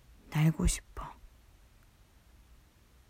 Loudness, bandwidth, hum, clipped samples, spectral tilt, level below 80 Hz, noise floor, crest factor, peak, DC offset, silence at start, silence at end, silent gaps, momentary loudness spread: -31 LUFS; 16 kHz; none; under 0.1%; -5.5 dB/octave; -44 dBFS; -62 dBFS; 18 dB; -18 dBFS; under 0.1%; 0.3 s; 1.85 s; none; 18 LU